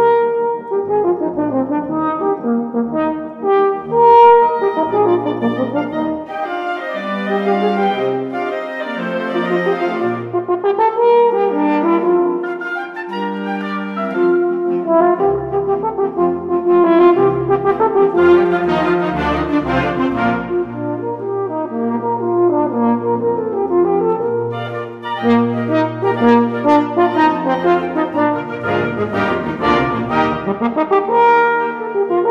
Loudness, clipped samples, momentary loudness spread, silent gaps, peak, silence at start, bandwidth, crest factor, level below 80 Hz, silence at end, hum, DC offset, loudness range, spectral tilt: -16 LUFS; under 0.1%; 10 LU; none; 0 dBFS; 0 s; 6.4 kHz; 14 dB; -46 dBFS; 0 s; none; under 0.1%; 5 LU; -8 dB/octave